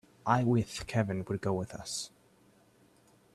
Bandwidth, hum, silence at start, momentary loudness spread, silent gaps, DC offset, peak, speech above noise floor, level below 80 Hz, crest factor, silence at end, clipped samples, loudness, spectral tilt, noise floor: 13.5 kHz; none; 0.25 s; 10 LU; none; under 0.1%; -12 dBFS; 33 dB; -60 dBFS; 22 dB; 1.3 s; under 0.1%; -32 LUFS; -5.5 dB/octave; -64 dBFS